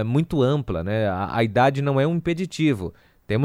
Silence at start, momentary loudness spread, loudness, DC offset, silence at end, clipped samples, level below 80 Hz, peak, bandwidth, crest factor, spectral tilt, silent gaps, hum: 0 s; 7 LU; -22 LUFS; under 0.1%; 0 s; under 0.1%; -46 dBFS; -6 dBFS; 13.5 kHz; 16 dB; -7.5 dB/octave; none; none